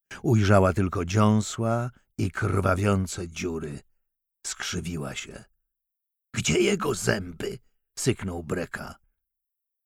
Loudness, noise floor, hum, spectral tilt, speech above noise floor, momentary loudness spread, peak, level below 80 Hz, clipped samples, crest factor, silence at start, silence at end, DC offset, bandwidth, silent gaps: -26 LUFS; -84 dBFS; none; -5.5 dB/octave; 59 dB; 15 LU; -6 dBFS; -50 dBFS; under 0.1%; 20 dB; 0.1 s; 0.9 s; under 0.1%; 15 kHz; none